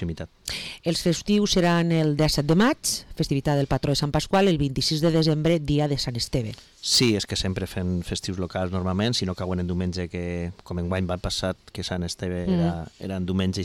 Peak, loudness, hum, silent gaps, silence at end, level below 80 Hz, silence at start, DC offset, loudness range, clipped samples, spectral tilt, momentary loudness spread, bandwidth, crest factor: -12 dBFS; -24 LUFS; none; none; 0 s; -42 dBFS; 0 s; under 0.1%; 6 LU; under 0.1%; -5 dB/octave; 10 LU; 18 kHz; 12 dB